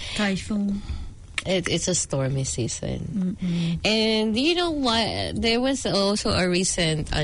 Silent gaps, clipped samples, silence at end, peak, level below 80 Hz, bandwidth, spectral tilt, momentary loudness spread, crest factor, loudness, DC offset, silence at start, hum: none; under 0.1%; 0 s; -10 dBFS; -40 dBFS; 11 kHz; -4 dB/octave; 7 LU; 14 dB; -24 LUFS; under 0.1%; 0 s; none